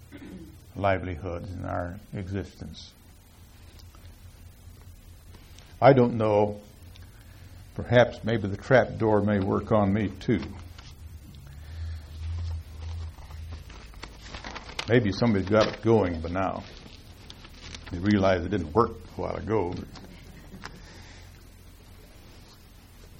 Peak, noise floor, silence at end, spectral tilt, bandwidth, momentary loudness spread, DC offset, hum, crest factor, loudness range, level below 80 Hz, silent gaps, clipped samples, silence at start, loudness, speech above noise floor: -6 dBFS; -51 dBFS; 0.05 s; -7 dB/octave; 16.5 kHz; 24 LU; under 0.1%; none; 22 dB; 14 LU; -46 dBFS; none; under 0.1%; 0 s; -26 LUFS; 27 dB